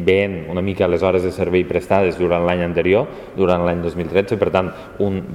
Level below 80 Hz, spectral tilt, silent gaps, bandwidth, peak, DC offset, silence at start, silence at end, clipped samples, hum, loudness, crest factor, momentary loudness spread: -44 dBFS; -7.5 dB/octave; none; 13 kHz; 0 dBFS; under 0.1%; 0 s; 0 s; under 0.1%; none; -18 LUFS; 18 dB; 6 LU